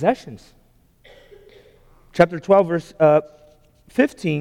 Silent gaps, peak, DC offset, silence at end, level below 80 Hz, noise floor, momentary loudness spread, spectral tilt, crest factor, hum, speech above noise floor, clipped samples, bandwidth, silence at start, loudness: none; -2 dBFS; under 0.1%; 0 s; -54 dBFS; -54 dBFS; 13 LU; -7.5 dB/octave; 18 dB; none; 36 dB; under 0.1%; 12.5 kHz; 0 s; -19 LUFS